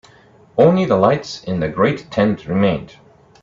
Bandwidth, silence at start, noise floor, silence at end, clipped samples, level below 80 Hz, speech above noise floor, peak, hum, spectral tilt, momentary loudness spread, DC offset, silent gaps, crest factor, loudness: 7.6 kHz; 0.55 s; -48 dBFS; 0.6 s; under 0.1%; -48 dBFS; 32 dB; 0 dBFS; none; -7.5 dB/octave; 10 LU; under 0.1%; none; 18 dB; -17 LUFS